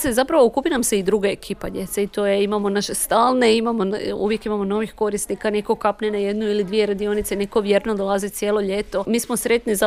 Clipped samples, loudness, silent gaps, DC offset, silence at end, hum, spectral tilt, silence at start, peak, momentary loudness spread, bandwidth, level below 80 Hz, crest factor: under 0.1%; -21 LUFS; none; under 0.1%; 0 s; none; -4 dB/octave; 0 s; -4 dBFS; 7 LU; 16 kHz; -46 dBFS; 16 dB